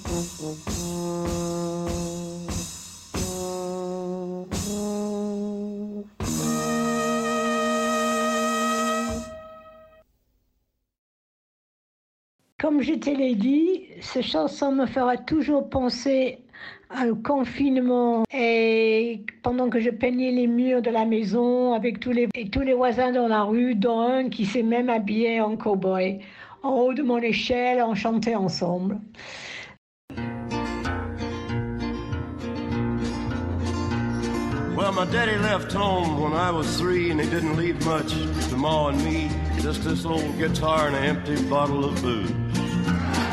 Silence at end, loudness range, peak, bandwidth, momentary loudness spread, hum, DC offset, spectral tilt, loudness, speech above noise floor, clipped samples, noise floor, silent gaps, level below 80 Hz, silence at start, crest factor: 0 s; 7 LU; -10 dBFS; 15.5 kHz; 10 LU; none; under 0.1%; -5.5 dB/octave; -25 LUFS; 51 dB; under 0.1%; -74 dBFS; 10.98-12.39 s, 12.52-12.59 s, 29.78-30.08 s; -42 dBFS; 0 s; 16 dB